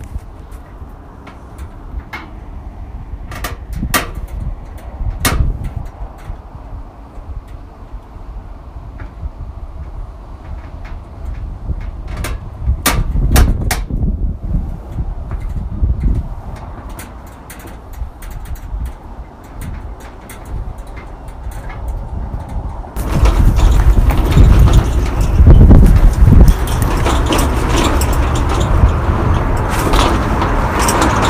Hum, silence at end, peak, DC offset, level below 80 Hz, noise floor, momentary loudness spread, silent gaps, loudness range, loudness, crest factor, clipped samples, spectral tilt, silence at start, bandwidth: none; 0 s; 0 dBFS; under 0.1%; -16 dBFS; -33 dBFS; 22 LU; none; 21 LU; -15 LUFS; 14 dB; 0.6%; -5.5 dB/octave; 0 s; 16 kHz